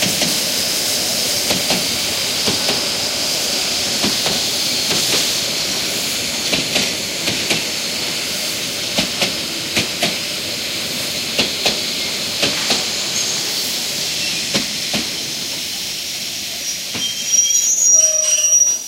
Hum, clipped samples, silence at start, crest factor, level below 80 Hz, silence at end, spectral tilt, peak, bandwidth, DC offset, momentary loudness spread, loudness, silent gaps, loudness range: none; under 0.1%; 0 s; 18 dB; -50 dBFS; 0 s; -0.5 dB/octave; -2 dBFS; 16 kHz; under 0.1%; 8 LU; -16 LUFS; none; 3 LU